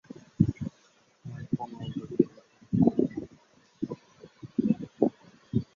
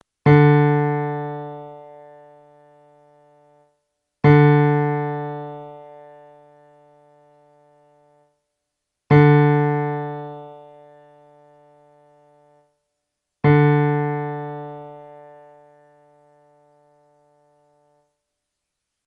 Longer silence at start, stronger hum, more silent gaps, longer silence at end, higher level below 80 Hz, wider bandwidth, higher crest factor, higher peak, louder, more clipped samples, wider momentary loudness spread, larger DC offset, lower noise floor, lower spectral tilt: first, 0.4 s vs 0.25 s; neither; neither; second, 0.1 s vs 4.05 s; about the same, -54 dBFS vs -54 dBFS; first, 7.2 kHz vs 4.7 kHz; first, 24 dB vs 18 dB; about the same, -6 dBFS vs -4 dBFS; second, -30 LUFS vs -17 LUFS; neither; second, 19 LU vs 25 LU; neither; second, -64 dBFS vs -80 dBFS; about the same, -10 dB/octave vs -10.5 dB/octave